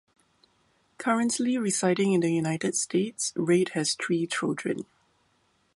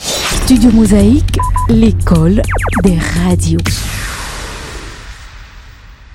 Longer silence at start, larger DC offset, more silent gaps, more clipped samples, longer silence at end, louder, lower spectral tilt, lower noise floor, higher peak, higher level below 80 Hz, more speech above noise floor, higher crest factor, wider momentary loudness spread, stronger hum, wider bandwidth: first, 1 s vs 0 s; neither; neither; neither; first, 0.9 s vs 0 s; second, -27 LUFS vs -11 LUFS; about the same, -4.5 dB/octave vs -5.5 dB/octave; first, -69 dBFS vs -35 dBFS; second, -10 dBFS vs 0 dBFS; second, -72 dBFS vs -20 dBFS; first, 43 dB vs 26 dB; first, 18 dB vs 12 dB; second, 7 LU vs 18 LU; neither; second, 11.5 kHz vs 16.5 kHz